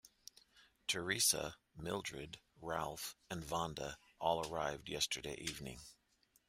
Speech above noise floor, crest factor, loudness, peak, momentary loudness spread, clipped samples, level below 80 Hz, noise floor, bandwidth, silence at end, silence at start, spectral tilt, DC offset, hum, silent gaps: 28 dB; 24 dB; -40 LUFS; -18 dBFS; 18 LU; under 0.1%; -66 dBFS; -70 dBFS; 16 kHz; 0.55 s; 0.05 s; -2 dB/octave; under 0.1%; none; none